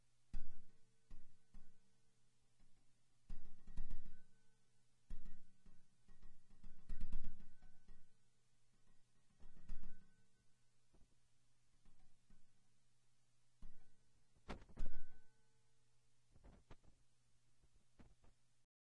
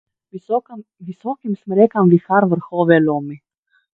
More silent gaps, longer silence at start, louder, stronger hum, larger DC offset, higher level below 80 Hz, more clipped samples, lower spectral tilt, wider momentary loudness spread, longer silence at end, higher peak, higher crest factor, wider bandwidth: neither; about the same, 0.35 s vs 0.35 s; second, -61 LUFS vs -17 LUFS; neither; neither; first, -54 dBFS vs -66 dBFS; neither; second, -6 dB/octave vs -11 dB/octave; second, 14 LU vs 21 LU; first, 2.15 s vs 0.6 s; second, -26 dBFS vs 0 dBFS; about the same, 18 dB vs 18 dB; second, 2.6 kHz vs 4 kHz